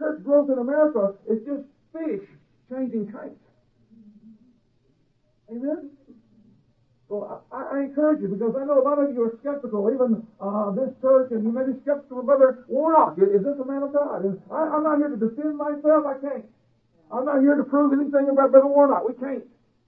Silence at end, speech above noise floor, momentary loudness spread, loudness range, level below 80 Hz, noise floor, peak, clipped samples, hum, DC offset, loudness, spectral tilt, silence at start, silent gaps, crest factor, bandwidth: 0.45 s; 44 dB; 15 LU; 16 LU; -72 dBFS; -66 dBFS; -2 dBFS; under 0.1%; none; under 0.1%; -22 LUFS; -12 dB/octave; 0 s; none; 20 dB; 2.7 kHz